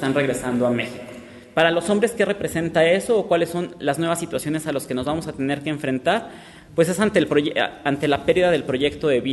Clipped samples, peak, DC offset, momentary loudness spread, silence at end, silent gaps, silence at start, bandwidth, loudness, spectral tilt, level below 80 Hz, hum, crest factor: under 0.1%; -4 dBFS; under 0.1%; 7 LU; 0 s; none; 0 s; 12.5 kHz; -21 LUFS; -5 dB/octave; -52 dBFS; none; 16 dB